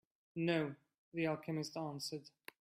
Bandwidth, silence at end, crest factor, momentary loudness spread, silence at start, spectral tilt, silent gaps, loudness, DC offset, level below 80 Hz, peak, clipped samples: 15.5 kHz; 0.35 s; 20 dB; 14 LU; 0.35 s; -5.5 dB/octave; 0.98-1.12 s; -41 LUFS; under 0.1%; -84 dBFS; -22 dBFS; under 0.1%